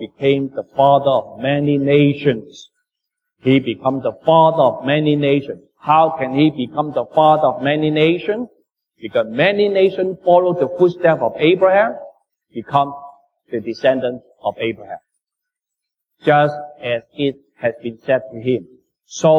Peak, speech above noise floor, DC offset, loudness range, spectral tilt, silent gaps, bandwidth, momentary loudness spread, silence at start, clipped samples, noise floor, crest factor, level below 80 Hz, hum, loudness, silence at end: -2 dBFS; 67 dB; under 0.1%; 6 LU; -7 dB/octave; none; 7.4 kHz; 13 LU; 0 s; under 0.1%; -83 dBFS; 16 dB; -60 dBFS; none; -17 LUFS; 0 s